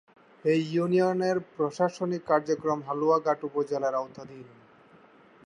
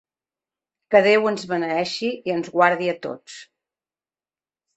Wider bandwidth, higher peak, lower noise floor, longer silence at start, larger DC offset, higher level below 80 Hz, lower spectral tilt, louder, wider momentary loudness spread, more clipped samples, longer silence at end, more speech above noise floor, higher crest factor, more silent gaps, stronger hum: first, 10.5 kHz vs 8.4 kHz; second, -10 dBFS vs -2 dBFS; second, -56 dBFS vs under -90 dBFS; second, 0.45 s vs 0.9 s; neither; second, -76 dBFS vs -70 dBFS; first, -7 dB/octave vs -5 dB/octave; second, -27 LUFS vs -20 LUFS; second, 9 LU vs 18 LU; neither; second, 1 s vs 1.35 s; second, 29 dB vs over 69 dB; about the same, 18 dB vs 22 dB; neither; neither